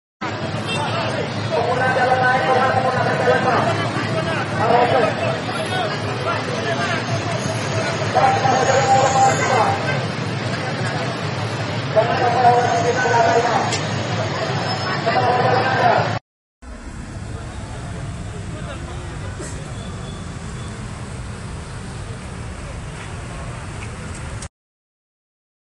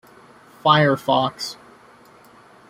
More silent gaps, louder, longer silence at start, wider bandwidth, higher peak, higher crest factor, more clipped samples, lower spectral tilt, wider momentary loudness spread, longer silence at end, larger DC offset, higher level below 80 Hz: first, 16.21-16.61 s vs none; about the same, -19 LUFS vs -19 LUFS; second, 0.2 s vs 0.65 s; second, 11.5 kHz vs 16 kHz; about the same, -2 dBFS vs -2 dBFS; about the same, 18 dB vs 20 dB; neither; about the same, -5 dB/octave vs -5.5 dB/octave; about the same, 16 LU vs 15 LU; about the same, 1.25 s vs 1.15 s; neither; first, -40 dBFS vs -62 dBFS